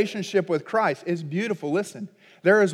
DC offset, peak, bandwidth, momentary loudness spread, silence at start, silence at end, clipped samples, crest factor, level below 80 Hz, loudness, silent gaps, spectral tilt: under 0.1%; -8 dBFS; 13.5 kHz; 12 LU; 0 s; 0 s; under 0.1%; 16 dB; -86 dBFS; -25 LUFS; none; -5.5 dB/octave